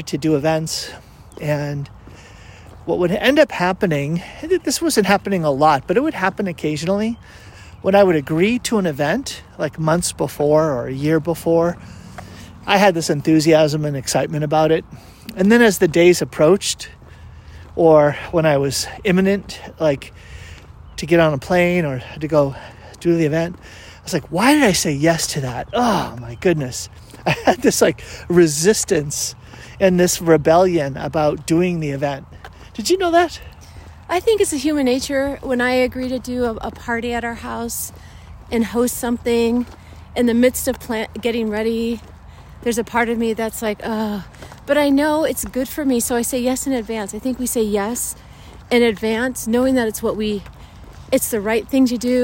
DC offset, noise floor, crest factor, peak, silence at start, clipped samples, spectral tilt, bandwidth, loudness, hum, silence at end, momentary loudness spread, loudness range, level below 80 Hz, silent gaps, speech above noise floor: under 0.1%; -40 dBFS; 18 dB; -2 dBFS; 0 s; under 0.1%; -5 dB/octave; 16.5 kHz; -18 LUFS; none; 0 s; 14 LU; 5 LU; -44 dBFS; none; 23 dB